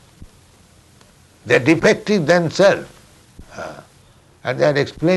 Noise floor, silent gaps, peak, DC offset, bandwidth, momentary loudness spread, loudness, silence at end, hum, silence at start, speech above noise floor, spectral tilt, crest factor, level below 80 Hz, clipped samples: -50 dBFS; none; -2 dBFS; under 0.1%; 12 kHz; 19 LU; -16 LUFS; 0 s; none; 0.2 s; 35 dB; -5.5 dB/octave; 16 dB; -50 dBFS; under 0.1%